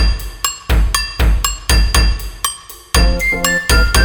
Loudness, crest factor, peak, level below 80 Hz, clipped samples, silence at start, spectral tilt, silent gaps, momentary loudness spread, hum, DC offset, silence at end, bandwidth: -15 LUFS; 14 dB; 0 dBFS; -16 dBFS; under 0.1%; 0 s; -3 dB/octave; none; 8 LU; none; under 0.1%; 0 s; 19.5 kHz